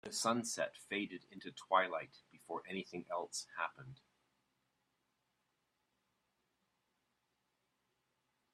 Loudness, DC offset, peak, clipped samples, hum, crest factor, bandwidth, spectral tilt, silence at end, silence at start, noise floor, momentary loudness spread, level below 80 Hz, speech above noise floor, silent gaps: -40 LUFS; under 0.1%; -16 dBFS; under 0.1%; none; 28 dB; 13.5 kHz; -2.5 dB/octave; 4.6 s; 0.05 s; -84 dBFS; 17 LU; -86 dBFS; 43 dB; none